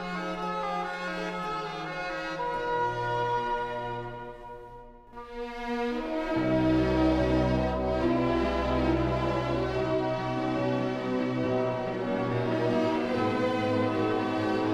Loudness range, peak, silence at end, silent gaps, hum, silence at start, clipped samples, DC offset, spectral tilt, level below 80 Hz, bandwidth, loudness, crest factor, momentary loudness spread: 6 LU; -14 dBFS; 0 s; none; none; 0 s; under 0.1%; under 0.1%; -7 dB/octave; -44 dBFS; 10 kHz; -29 LUFS; 16 dB; 11 LU